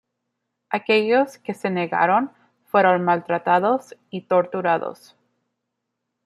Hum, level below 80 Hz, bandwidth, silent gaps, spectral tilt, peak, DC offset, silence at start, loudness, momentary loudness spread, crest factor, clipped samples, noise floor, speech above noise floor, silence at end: none; -74 dBFS; 13 kHz; none; -6.5 dB/octave; -4 dBFS; under 0.1%; 0.7 s; -21 LUFS; 11 LU; 18 dB; under 0.1%; -79 dBFS; 59 dB; 1.3 s